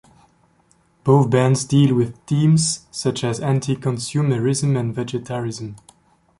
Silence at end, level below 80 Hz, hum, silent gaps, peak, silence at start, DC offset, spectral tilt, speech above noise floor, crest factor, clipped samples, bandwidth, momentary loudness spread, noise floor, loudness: 0.65 s; -54 dBFS; none; none; -2 dBFS; 1.05 s; under 0.1%; -6 dB/octave; 40 dB; 16 dB; under 0.1%; 11.5 kHz; 11 LU; -59 dBFS; -19 LUFS